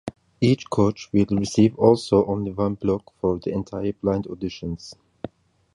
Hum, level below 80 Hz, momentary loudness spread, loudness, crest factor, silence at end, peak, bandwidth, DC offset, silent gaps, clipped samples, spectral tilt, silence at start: none; -48 dBFS; 19 LU; -23 LUFS; 20 dB; 0.5 s; -4 dBFS; 11.5 kHz; under 0.1%; none; under 0.1%; -7 dB/octave; 0.05 s